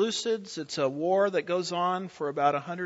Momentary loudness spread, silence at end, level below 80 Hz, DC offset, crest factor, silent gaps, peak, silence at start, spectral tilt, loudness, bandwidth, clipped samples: 7 LU; 0 s; -76 dBFS; under 0.1%; 16 dB; none; -12 dBFS; 0 s; -4 dB/octave; -28 LUFS; 8 kHz; under 0.1%